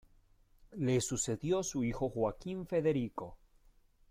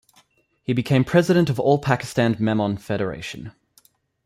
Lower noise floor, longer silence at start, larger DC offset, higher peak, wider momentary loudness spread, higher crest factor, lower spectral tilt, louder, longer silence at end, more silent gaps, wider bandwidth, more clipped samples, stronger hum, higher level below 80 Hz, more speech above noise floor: first, -66 dBFS vs -60 dBFS; about the same, 0.7 s vs 0.7 s; neither; second, -20 dBFS vs -4 dBFS; second, 11 LU vs 16 LU; about the same, 16 dB vs 18 dB; second, -5.5 dB/octave vs -7 dB/octave; second, -35 LUFS vs -21 LUFS; about the same, 0.75 s vs 0.75 s; neither; about the same, 15.5 kHz vs 15.5 kHz; neither; neither; about the same, -58 dBFS vs -54 dBFS; second, 31 dB vs 40 dB